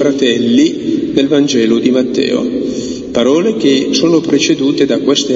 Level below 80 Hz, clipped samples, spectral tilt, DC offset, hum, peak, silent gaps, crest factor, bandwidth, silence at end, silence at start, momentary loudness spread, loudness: -48 dBFS; under 0.1%; -4.5 dB/octave; under 0.1%; none; 0 dBFS; none; 12 dB; 7.8 kHz; 0 s; 0 s; 6 LU; -12 LUFS